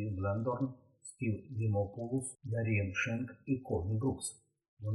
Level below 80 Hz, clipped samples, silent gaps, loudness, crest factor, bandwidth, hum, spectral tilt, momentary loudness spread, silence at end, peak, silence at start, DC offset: -66 dBFS; under 0.1%; 4.68-4.77 s; -36 LUFS; 14 dB; 12 kHz; none; -6.5 dB/octave; 7 LU; 0 s; -22 dBFS; 0 s; under 0.1%